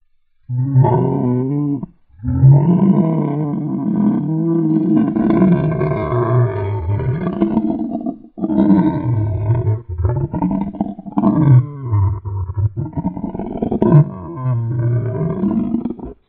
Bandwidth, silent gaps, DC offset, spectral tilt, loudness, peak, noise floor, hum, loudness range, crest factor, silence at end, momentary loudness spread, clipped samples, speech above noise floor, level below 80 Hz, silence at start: 3.9 kHz; none; under 0.1%; -11 dB/octave; -17 LUFS; 0 dBFS; -44 dBFS; none; 3 LU; 16 dB; 0.15 s; 11 LU; under 0.1%; 29 dB; -38 dBFS; 0.5 s